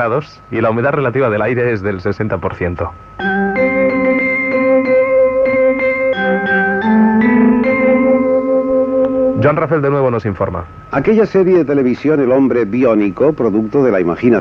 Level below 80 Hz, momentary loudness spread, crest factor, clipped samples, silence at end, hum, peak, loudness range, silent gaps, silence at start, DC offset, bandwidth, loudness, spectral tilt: -42 dBFS; 8 LU; 12 dB; under 0.1%; 0 s; none; 0 dBFS; 4 LU; none; 0 s; under 0.1%; 6.2 kHz; -13 LUFS; -9 dB/octave